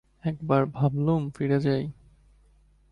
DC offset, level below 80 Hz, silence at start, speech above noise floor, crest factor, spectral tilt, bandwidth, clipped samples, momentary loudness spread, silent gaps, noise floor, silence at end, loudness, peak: under 0.1%; -56 dBFS; 0.25 s; 35 dB; 18 dB; -9.5 dB/octave; 5.4 kHz; under 0.1%; 9 LU; none; -60 dBFS; 1 s; -26 LUFS; -10 dBFS